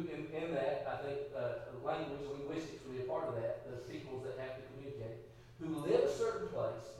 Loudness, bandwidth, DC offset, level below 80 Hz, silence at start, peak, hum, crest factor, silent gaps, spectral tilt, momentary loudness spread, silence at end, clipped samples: -40 LUFS; 14 kHz; under 0.1%; -66 dBFS; 0 s; -20 dBFS; none; 20 dB; none; -6.5 dB/octave; 12 LU; 0 s; under 0.1%